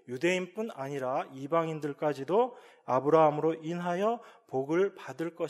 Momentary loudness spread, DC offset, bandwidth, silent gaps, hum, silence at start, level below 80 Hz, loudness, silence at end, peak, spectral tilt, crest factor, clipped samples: 12 LU; under 0.1%; 13 kHz; none; none; 0.1 s; -84 dBFS; -30 LUFS; 0 s; -10 dBFS; -6.5 dB/octave; 20 dB; under 0.1%